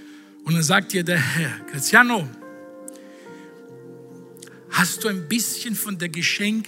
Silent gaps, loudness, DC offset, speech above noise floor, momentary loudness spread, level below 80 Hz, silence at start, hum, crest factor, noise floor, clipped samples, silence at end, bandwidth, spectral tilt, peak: none; -20 LUFS; under 0.1%; 21 dB; 26 LU; -72 dBFS; 0 s; none; 22 dB; -43 dBFS; under 0.1%; 0 s; 16 kHz; -3.5 dB/octave; -2 dBFS